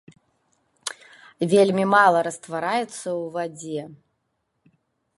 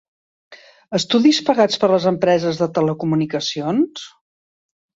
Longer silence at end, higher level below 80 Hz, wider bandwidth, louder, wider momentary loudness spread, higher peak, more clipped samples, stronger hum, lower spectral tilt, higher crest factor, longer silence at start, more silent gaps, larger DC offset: first, 1.2 s vs 0.85 s; second, -74 dBFS vs -62 dBFS; first, 11.5 kHz vs 8 kHz; second, -22 LUFS vs -18 LUFS; first, 17 LU vs 9 LU; about the same, -4 dBFS vs -2 dBFS; neither; neither; about the same, -5 dB/octave vs -5.5 dB/octave; about the same, 20 dB vs 18 dB; first, 0.85 s vs 0.5 s; neither; neither